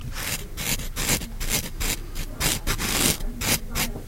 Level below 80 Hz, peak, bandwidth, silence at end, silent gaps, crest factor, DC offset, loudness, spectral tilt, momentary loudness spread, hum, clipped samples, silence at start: -32 dBFS; -2 dBFS; 17 kHz; 0 s; none; 24 dB; under 0.1%; -25 LUFS; -2 dB/octave; 7 LU; none; under 0.1%; 0 s